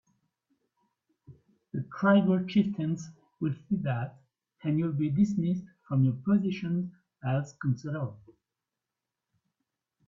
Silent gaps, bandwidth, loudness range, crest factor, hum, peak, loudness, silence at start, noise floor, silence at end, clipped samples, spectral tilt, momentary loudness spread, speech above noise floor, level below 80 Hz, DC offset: none; 7.4 kHz; 4 LU; 20 dB; none; -12 dBFS; -30 LUFS; 1.3 s; -88 dBFS; 1.9 s; under 0.1%; -8.5 dB/octave; 14 LU; 60 dB; -68 dBFS; under 0.1%